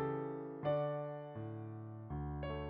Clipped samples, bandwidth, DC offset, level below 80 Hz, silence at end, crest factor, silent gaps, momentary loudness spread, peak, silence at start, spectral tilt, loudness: under 0.1%; 4.9 kHz; under 0.1%; -56 dBFS; 0 s; 16 dB; none; 10 LU; -26 dBFS; 0 s; -7.5 dB/octave; -42 LUFS